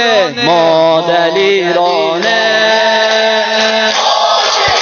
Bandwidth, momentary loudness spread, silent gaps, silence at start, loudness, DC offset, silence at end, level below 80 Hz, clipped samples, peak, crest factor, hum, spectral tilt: 7.4 kHz; 2 LU; none; 0 s; -10 LUFS; under 0.1%; 0 s; -50 dBFS; under 0.1%; 0 dBFS; 10 dB; none; -2.5 dB/octave